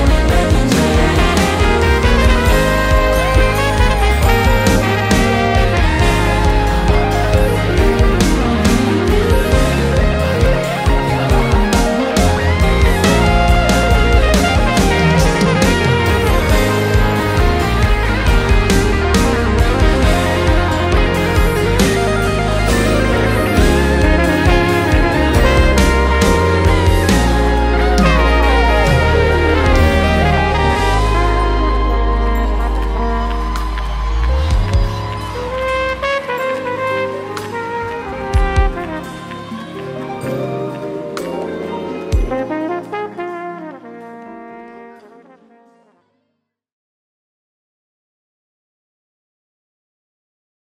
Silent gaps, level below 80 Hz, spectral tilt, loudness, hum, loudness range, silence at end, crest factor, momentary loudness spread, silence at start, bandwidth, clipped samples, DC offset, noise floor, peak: none; -18 dBFS; -5.5 dB/octave; -14 LUFS; none; 9 LU; 5.7 s; 14 dB; 11 LU; 0 s; 16 kHz; under 0.1%; under 0.1%; -72 dBFS; 0 dBFS